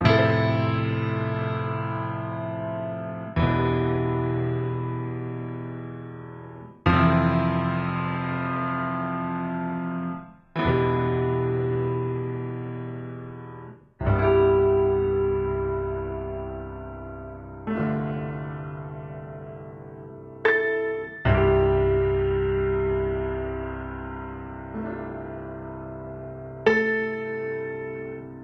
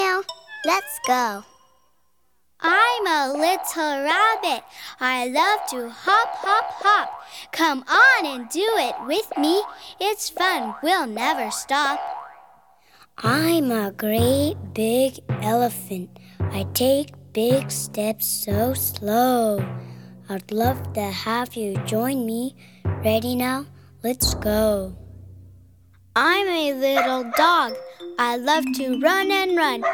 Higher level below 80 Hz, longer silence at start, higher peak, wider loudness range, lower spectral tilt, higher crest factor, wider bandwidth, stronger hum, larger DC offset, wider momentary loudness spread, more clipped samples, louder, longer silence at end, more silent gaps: first, -40 dBFS vs -48 dBFS; about the same, 0 s vs 0 s; about the same, -6 dBFS vs -4 dBFS; about the same, 7 LU vs 5 LU; first, -9 dB/octave vs -4 dB/octave; about the same, 20 dB vs 18 dB; second, 6.2 kHz vs 19 kHz; neither; neither; first, 17 LU vs 12 LU; neither; second, -26 LUFS vs -21 LUFS; about the same, 0 s vs 0 s; neither